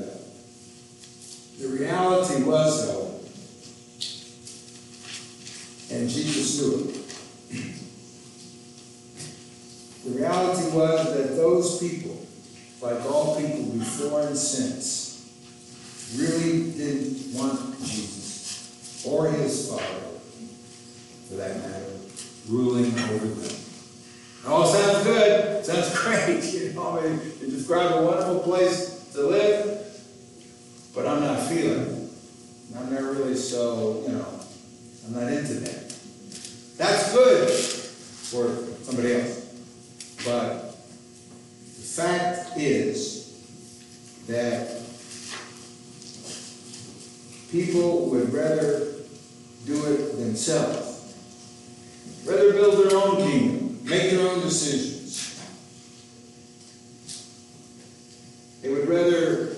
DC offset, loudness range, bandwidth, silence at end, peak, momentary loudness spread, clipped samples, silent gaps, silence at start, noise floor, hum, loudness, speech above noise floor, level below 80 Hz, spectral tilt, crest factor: under 0.1%; 10 LU; 12 kHz; 0 s; -8 dBFS; 24 LU; under 0.1%; none; 0 s; -48 dBFS; none; -24 LUFS; 24 dB; -68 dBFS; -4.5 dB/octave; 20 dB